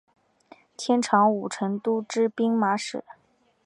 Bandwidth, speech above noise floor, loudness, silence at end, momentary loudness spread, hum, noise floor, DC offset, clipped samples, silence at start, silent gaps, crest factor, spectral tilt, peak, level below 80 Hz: 11 kHz; 31 dB; -24 LUFS; 0.55 s; 11 LU; none; -55 dBFS; under 0.1%; under 0.1%; 0.8 s; none; 20 dB; -5 dB/octave; -6 dBFS; -76 dBFS